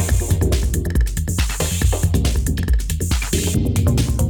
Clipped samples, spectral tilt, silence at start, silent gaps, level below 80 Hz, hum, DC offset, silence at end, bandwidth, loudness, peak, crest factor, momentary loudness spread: under 0.1%; -5 dB/octave; 0 s; none; -20 dBFS; none; under 0.1%; 0 s; 19 kHz; -19 LUFS; -6 dBFS; 12 dB; 3 LU